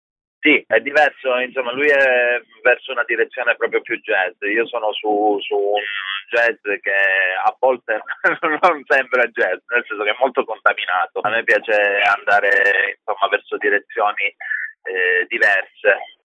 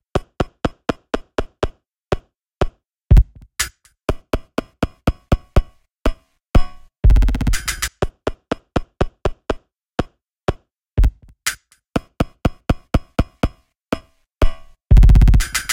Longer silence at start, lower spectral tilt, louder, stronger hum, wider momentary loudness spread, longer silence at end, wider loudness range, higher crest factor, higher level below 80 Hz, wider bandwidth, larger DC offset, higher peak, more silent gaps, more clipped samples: first, 0.45 s vs 0.15 s; second, -3.5 dB/octave vs -5.5 dB/octave; first, -17 LUFS vs -21 LUFS; neither; second, 7 LU vs 12 LU; first, 0.15 s vs 0 s; about the same, 3 LU vs 5 LU; about the same, 18 dB vs 18 dB; second, -78 dBFS vs -20 dBFS; second, 9.8 kHz vs 16.5 kHz; neither; about the same, 0 dBFS vs 0 dBFS; neither; neither